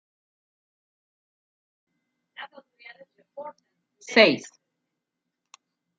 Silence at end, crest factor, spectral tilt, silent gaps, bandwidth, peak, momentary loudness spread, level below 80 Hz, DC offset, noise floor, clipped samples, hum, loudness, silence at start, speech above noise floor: 1.6 s; 28 dB; -3.5 dB/octave; none; 9 kHz; -4 dBFS; 25 LU; -80 dBFS; under 0.1%; -84 dBFS; under 0.1%; none; -20 LUFS; 2.4 s; 59 dB